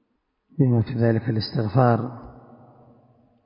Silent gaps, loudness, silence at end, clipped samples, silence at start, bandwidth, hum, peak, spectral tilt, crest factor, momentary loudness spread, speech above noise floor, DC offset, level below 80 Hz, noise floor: none; -22 LUFS; 1.05 s; under 0.1%; 0.55 s; 5.4 kHz; none; -4 dBFS; -12 dB/octave; 20 dB; 15 LU; 51 dB; under 0.1%; -52 dBFS; -72 dBFS